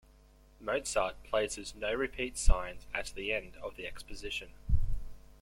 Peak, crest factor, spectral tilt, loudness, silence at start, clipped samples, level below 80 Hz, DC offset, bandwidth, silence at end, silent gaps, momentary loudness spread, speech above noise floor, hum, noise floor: -10 dBFS; 24 dB; -3.5 dB/octave; -36 LUFS; 0.6 s; under 0.1%; -36 dBFS; under 0.1%; 12 kHz; 0.25 s; none; 11 LU; 27 dB; none; -60 dBFS